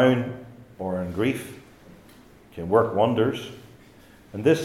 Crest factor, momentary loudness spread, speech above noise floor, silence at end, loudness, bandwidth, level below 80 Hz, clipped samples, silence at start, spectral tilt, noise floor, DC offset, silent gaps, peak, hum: 20 dB; 22 LU; 28 dB; 0 s; -25 LUFS; 15 kHz; -60 dBFS; under 0.1%; 0 s; -6.5 dB/octave; -51 dBFS; under 0.1%; none; -4 dBFS; none